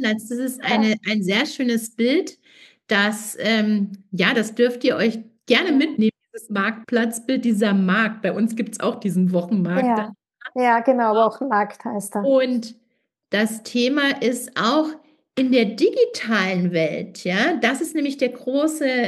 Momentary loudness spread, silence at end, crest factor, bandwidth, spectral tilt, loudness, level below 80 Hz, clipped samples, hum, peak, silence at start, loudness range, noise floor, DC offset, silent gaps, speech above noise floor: 7 LU; 0 s; 18 dB; 12.5 kHz; -5 dB/octave; -21 LUFS; -82 dBFS; under 0.1%; none; -4 dBFS; 0 s; 1 LU; -70 dBFS; under 0.1%; none; 50 dB